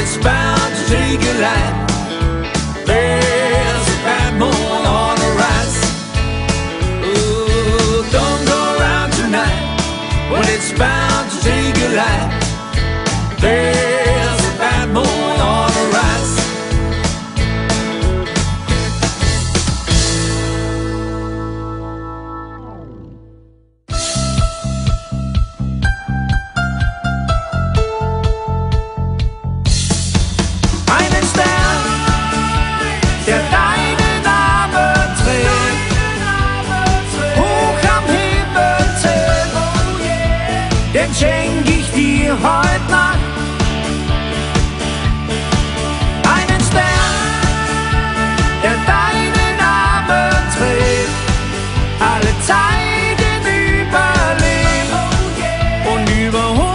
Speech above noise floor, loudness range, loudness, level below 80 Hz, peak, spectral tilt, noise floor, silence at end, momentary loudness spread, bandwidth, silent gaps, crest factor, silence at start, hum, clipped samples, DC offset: 34 dB; 5 LU; -15 LUFS; -22 dBFS; 0 dBFS; -4.5 dB/octave; -47 dBFS; 0 s; 6 LU; 11 kHz; none; 14 dB; 0 s; none; under 0.1%; under 0.1%